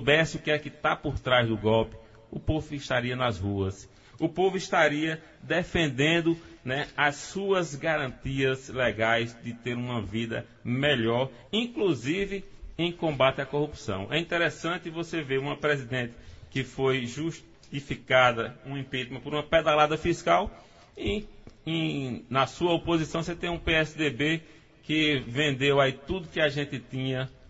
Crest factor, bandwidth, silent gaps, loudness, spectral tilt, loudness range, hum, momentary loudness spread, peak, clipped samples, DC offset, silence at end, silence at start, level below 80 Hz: 20 dB; 8 kHz; none; -28 LUFS; -5.5 dB/octave; 3 LU; none; 11 LU; -6 dBFS; under 0.1%; under 0.1%; 0.05 s; 0 s; -48 dBFS